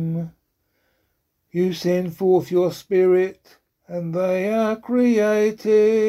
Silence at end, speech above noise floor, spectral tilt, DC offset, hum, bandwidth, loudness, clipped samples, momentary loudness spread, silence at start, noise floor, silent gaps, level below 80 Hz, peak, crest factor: 0 s; 52 dB; -7 dB/octave; under 0.1%; none; 15 kHz; -20 LUFS; under 0.1%; 11 LU; 0 s; -71 dBFS; none; -64 dBFS; -6 dBFS; 14 dB